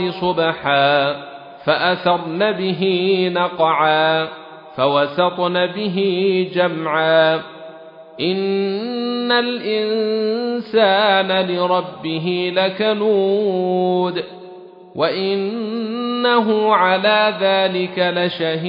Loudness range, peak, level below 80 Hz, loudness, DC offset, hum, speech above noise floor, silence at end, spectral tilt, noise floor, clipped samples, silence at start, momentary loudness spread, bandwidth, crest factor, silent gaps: 3 LU; -2 dBFS; -66 dBFS; -17 LUFS; under 0.1%; none; 21 dB; 0 s; -8.5 dB/octave; -39 dBFS; under 0.1%; 0 s; 9 LU; 5.4 kHz; 16 dB; none